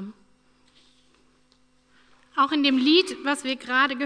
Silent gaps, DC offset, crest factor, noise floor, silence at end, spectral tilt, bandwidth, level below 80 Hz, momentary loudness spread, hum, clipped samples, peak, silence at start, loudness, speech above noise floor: none; under 0.1%; 18 dB; -62 dBFS; 0 s; -2.5 dB/octave; 11 kHz; -72 dBFS; 10 LU; none; under 0.1%; -8 dBFS; 0 s; -22 LUFS; 40 dB